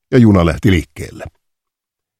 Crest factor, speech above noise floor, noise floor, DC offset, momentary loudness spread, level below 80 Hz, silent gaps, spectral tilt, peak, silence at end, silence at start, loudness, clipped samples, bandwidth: 14 dB; 70 dB; -82 dBFS; under 0.1%; 20 LU; -32 dBFS; none; -7.5 dB/octave; 0 dBFS; 0.9 s; 0.1 s; -12 LUFS; under 0.1%; 13.5 kHz